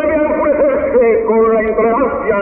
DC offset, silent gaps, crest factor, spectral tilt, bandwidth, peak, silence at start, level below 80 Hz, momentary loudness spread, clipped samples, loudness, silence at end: under 0.1%; none; 10 dB; -6.5 dB/octave; 3.3 kHz; -2 dBFS; 0 s; -38 dBFS; 2 LU; under 0.1%; -13 LUFS; 0 s